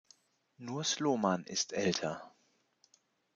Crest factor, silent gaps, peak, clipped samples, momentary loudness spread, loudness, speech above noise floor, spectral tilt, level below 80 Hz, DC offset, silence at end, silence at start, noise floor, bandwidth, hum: 24 dB; none; -14 dBFS; under 0.1%; 13 LU; -34 LUFS; 40 dB; -3.5 dB/octave; -78 dBFS; under 0.1%; 1.05 s; 0.6 s; -74 dBFS; 10 kHz; none